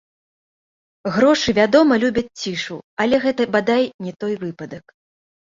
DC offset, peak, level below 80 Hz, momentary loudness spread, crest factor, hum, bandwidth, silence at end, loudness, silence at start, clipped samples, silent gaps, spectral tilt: under 0.1%; -2 dBFS; -54 dBFS; 16 LU; 18 dB; none; 7.8 kHz; 0.65 s; -18 LUFS; 1.05 s; under 0.1%; 2.84-2.97 s, 3.94-3.99 s; -5 dB/octave